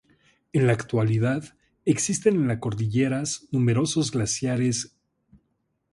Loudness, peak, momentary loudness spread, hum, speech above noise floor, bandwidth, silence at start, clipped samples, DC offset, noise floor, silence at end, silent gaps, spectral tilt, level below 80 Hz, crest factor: -24 LUFS; -6 dBFS; 6 LU; none; 50 dB; 11.5 kHz; 0.55 s; under 0.1%; under 0.1%; -74 dBFS; 1.05 s; none; -5.5 dB/octave; -56 dBFS; 18 dB